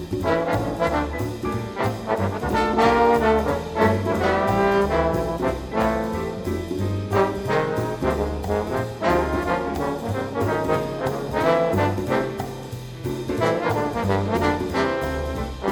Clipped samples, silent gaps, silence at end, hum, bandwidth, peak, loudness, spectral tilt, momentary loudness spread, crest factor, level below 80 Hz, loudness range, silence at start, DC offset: under 0.1%; none; 0 s; none; over 20 kHz; -6 dBFS; -23 LUFS; -6.5 dB/octave; 8 LU; 16 dB; -38 dBFS; 4 LU; 0 s; under 0.1%